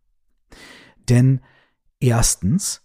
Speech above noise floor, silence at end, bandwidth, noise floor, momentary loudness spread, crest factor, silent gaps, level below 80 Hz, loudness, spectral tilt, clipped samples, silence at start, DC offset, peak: 46 dB; 0.1 s; 15.5 kHz; -63 dBFS; 8 LU; 16 dB; none; -34 dBFS; -18 LUFS; -5 dB/octave; under 0.1%; 1.1 s; under 0.1%; -4 dBFS